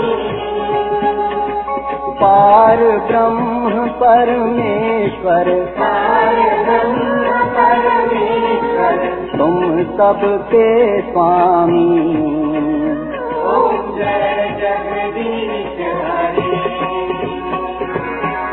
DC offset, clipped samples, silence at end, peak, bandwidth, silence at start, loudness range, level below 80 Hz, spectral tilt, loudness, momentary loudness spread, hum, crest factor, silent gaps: under 0.1%; under 0.1%; 0 s; 0 dBFS; 4.2 kHz; 0 s; 6 LU; -42 dBFS; -10 dB/octave; -14 LUFS; 9 LU; none; 14 dB; none